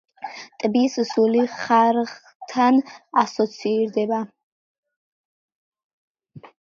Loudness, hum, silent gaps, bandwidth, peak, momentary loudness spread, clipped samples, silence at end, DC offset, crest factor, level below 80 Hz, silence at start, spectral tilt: -21 LUFS; none; 2.35-2.40 s, 4.43-4.83 s, 4.96-5.72 s, 5.84-6.15 s; 7.4 kHz; -4 dBFS; 17 LU; under 0.1%; 0.2 s; under 0.1%; 18 dB; -74 dBFS; 0.2 s; -5 dB/octave